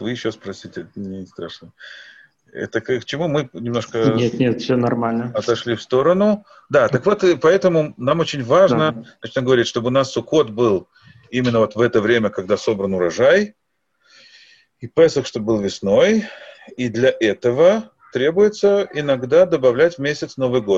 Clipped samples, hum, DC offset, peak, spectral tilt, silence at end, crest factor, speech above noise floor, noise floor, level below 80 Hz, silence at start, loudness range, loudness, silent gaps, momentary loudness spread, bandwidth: under 0.1%; none; under 0.1%; -2 dBFS; -6 dB/octave; 0 s; 16 dB; 46 dB; -64 dBFS; -56 dBFS; 0 s; 5 LU; -18 LUFS; none; 16 LU; 7.8 kHz